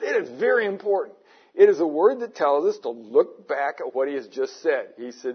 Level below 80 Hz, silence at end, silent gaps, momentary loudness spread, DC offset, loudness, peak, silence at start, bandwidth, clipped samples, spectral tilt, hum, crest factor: -86 dBFS; 0 s; none; 12 LU; under 0.1%; -23 LUFS; -4 dBFS; 0 s; 6.6 kHz; under 0.1%; -5 dB/octave; none; 18 dB